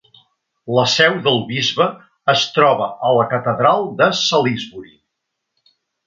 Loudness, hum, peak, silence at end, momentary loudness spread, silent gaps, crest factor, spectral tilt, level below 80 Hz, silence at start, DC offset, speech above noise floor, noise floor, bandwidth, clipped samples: -16 LUFS; none; 0 dBFS; 1.25 s; 7 LU; none; 18 dB; -4 dB/octave; -62 dBFS; 0.65 s; under 0.1%; 61 dB; -77 dBFS; 7.8 kHz; under 0.1%